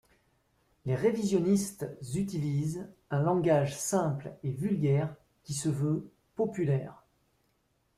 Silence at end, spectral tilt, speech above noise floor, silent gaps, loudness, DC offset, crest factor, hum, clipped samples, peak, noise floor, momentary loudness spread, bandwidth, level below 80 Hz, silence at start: 1.05 s; -6.5 dB/octave; 44 dB; none; -31 LUFS; under 0.1%; 16 dB; none; under 0.1%; -14 dBFS; -74 dBFS; 11 LU; 15 kHz; -64 dBFS; 0.85 s